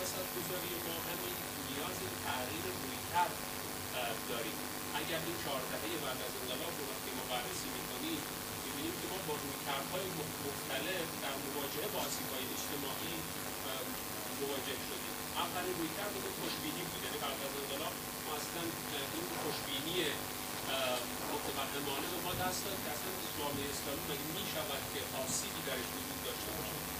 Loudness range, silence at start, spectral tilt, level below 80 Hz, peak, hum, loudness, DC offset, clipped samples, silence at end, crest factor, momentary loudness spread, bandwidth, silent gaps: 2 LU; 0 s; -2.5 dB/octave; -62 dBFS; -20 dBFS; none; -38 LUFS; under 0.1%; under 0.1%; 0 s; 20 dB; 3 LU; 16 kHz; none